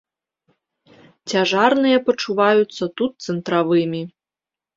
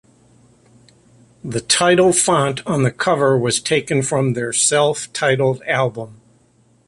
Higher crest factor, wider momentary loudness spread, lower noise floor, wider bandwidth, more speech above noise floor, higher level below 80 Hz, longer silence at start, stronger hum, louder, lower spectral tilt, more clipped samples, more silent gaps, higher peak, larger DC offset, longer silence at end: about the same, 18 dB vs 16 dB; about the same, 11 LU vs 10 LU; first, -89 dBFS vs -56 dBFS; second, 7.8 kHz vs 11.5 kHz; first, 71 dB vs 39 dB; second, -66 dBFS vs -54 dBFS; second, 1.25 s vs 1.45 s; neither; about the same, -19 LUFS vs -17 LUFS; first, -5 dB/octave vs -3.5 dB/octave; neither; neither; about the same, -2 dBFS vs -2 dBFS; neither; about the same, 0.7 s vs 0.75 s